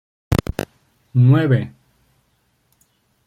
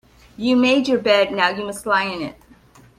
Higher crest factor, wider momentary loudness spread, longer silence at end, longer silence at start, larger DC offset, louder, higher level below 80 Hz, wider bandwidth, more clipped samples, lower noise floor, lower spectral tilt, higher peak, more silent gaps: about the same, 18 dB vs 18 dB; first, 18 LU vs 11 LU; first, 1.6 s vs 0.65 s; about the same, 0.3 s vs 0.4 s; neither; about the same, -18 LUFS vs -18 LUFS; first, -38 dBFS vs -56 dBFS; about the same, 15.5 kHz vs 14.5 kHz; neither; first, -64 dBFS vs -49 dBFS; first, -8 dB/octave vs -4 dB/octave; about the same, -2 dBFS vs -2 dBFS; neither